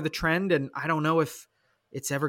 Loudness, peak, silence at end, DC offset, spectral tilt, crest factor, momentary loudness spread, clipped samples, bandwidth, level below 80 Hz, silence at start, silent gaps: -27 LUFS; -12 dBFS; 0 s; under 0.1%; -5 dB/octave; 16 dB; 13 LU; under 0.1%; 17 kHz; -52 dBFS; 0 s; none